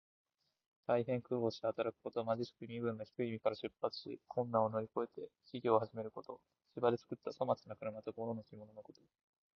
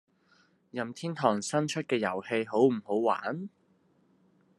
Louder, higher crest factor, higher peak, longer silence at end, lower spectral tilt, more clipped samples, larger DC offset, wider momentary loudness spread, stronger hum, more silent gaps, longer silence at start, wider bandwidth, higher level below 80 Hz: second, -40 LUFS vs -30 LUFS; about the same, 24 dB vs 22 dB; second, -16 dBFS vs -10 dBFS; second, 0.75 s vs 1.1 s; about the same, -5.5 dB/octave vs -5 dB/octave; neither; neither; first, 16 LU vs 12 LU; neither; neither; first, 0.9 s vs 0.75 s; second, 6.6 kHz vs 12 kHz; about the same, -78 dBFS vs -80 dBFS